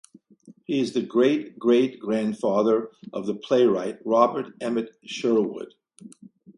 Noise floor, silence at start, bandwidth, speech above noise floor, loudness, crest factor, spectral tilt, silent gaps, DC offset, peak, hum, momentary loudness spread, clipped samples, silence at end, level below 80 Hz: -53 dBFS; 0.45 s; 11 kHz; 29 dB; -24 LUFS; 20 dB; -6 dB/octave; none; under 0.1%; -4 dBFS; none; 11 LU; under 0.1%; 0.05 s; -72 dBFS